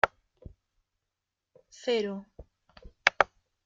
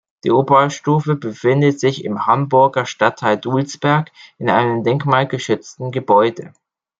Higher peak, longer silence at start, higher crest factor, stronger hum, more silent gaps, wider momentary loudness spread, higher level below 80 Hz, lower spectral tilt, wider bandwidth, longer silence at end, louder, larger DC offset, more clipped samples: about the same, -2 dBFS vs 0 dBFS; second, 0.05 s vs 0.25 s; first, 32 dB vs 16 dB; neither; neither; first, 12 LU vs 8 LU; about the same, -58 dBFS vs -62 dBFS; second, -3 dB/octave vs -6.5 dB/octave; about the same, 7.8 kHz vs 7.8 kHz; about the same, 0.4 s vs 0.5 s; second, -29 LUFS vs -16 LUFS; neither; neither